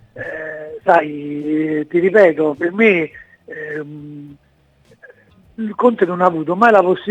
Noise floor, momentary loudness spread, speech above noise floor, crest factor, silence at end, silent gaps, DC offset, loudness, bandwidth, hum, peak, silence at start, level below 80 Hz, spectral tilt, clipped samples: -54 dBFS; 18 LU; 38 dB; 16 dB; 0 s; none; under 0.1%; -15 LUFS; 9 kHz; none; 0 dBFS; 0.15 s; -60 dBFS; -7.5 dB/octave; under 0.1%